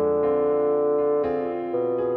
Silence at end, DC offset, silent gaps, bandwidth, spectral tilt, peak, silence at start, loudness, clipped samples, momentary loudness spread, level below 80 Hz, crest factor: 0 s; under 0.1%; none; 4.2 kHz; -10.5 dB/octave; -14 dBFS; 0 s; -23 LUFS; under 0.1%; 5 LU; -58 dBFS; 8 dB